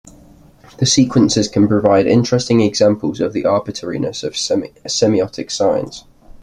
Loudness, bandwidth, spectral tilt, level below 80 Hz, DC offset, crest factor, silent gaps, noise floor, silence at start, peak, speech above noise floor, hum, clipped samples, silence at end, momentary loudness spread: -15 LUFS; 11.5 kHz; -5 dB/octave; -48 dBFS; under 0.1%; 16 dB; none; -44 dBFS; 0.8 s; 0 dBFS; 29 dB; none; under 0.1%; 0 s; 9 LU